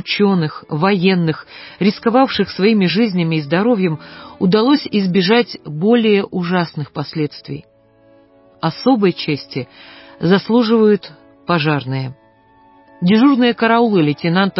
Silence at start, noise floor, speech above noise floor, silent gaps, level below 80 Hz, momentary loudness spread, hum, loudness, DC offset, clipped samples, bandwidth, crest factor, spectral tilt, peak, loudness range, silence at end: 0.05 s; -50 dBFS; 35 dB; none; -56 dBFS; 12 LU; none; -15 LUFS; under 0.1%; under 0.1%; 5.8 kHz; 14 dB; -10.5 dB/octave; -2 dBFS; 5 LU; 0 s